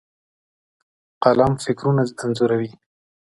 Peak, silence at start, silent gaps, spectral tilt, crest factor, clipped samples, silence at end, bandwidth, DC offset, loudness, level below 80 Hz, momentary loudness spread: 0 dBFS; 1.2 s; none; -7 dB/octave; 22 dB; under 0.1%; 0.55 s; 11.5 kHz; under 0.1%; -20 LUFS; -50 dBFS; 7 LU